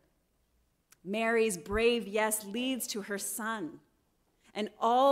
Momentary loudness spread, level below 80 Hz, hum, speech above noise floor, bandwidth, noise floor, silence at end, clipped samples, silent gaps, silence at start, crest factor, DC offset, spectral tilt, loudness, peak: 11 LU; -56 dBFS; none; 43 dB; 16 kHz; -73 dBFS; 0 s; under 0.1%; none; 1.05 s; 18 dB; under 0.1%; -3 dB/octave; -31 LUFS; -16 dBFS